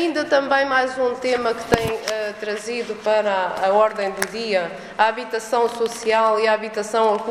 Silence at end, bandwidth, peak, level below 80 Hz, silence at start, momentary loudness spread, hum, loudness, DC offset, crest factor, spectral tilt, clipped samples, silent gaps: 0 s; 15.5 kHz; 0 dBFS; -50 dBFS; 0 s; 8 LU; none; -21 LUFS; under 0.1%; 20 dB; -3.5 dB/octave; under 0.1%; none